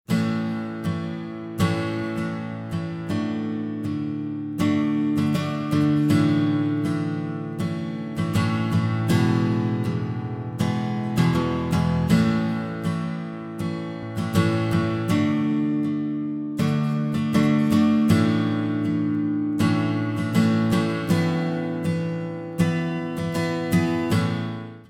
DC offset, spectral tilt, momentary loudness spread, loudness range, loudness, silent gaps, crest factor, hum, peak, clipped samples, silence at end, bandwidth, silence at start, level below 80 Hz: under 0.1%; -7 dB/octave; 10 LU; 5 LU; -24 LUFS; none; 16 dB; none; -6 dBFS; under 0.1%; 0.05 s; 16 kHz; 0.1 s; -50 dBFS